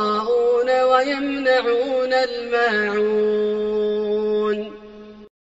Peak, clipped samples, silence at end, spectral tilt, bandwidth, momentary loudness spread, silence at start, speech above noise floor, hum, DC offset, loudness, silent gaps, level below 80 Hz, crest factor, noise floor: -4 dBFS; under 0.1%; 0.15 s; -2 dB/octave; 8 kHz; 5 LU; 0 s; 21 dB; none; under 0.1%; -20 LUFS; none; -56 dBFS; 16 dB; -40 dBFS